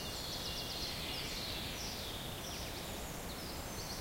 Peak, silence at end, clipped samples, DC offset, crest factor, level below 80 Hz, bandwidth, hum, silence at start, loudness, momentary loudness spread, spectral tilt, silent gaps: -28 dBFS; 0 s; under 0.1%; under 0.1%; 16 dB; -52 dBFS; 16 kHz; none; 0 s; -41 LUFS; 4 LU; -3 dB/octave; none